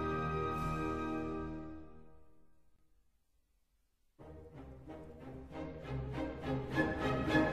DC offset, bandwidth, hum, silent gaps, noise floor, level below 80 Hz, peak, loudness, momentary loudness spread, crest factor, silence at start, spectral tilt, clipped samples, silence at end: under 0.1%; 14.5 kHz; none; none; -77 dBFS; -52 dBFS; -18 dBFS; -38 LUFS; 19 LU; 22 dB; 0 s; -7 dB/octave; under 0.1%; 0 s